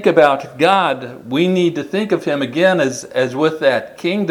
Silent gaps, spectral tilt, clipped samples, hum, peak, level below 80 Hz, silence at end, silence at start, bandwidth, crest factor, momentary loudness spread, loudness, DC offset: none; -5.5 dB/octave; under 0.1%; none; 0 dBFS; -62 dBFS; 0 s; 0 s; 15 kHz; 16 dB; 7 LU; -16 LUFS; under 0.1%